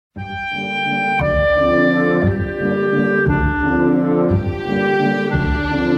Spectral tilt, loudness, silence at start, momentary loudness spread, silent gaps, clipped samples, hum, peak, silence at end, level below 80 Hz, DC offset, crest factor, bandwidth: -8 dB/octave; -17 LUFS; 0.15 s; 6 LU; none; under 0.1%; none; -4 dBFS; 0 s; -30 dBFS; under 0.1%; 12 dB; 8.4 kHz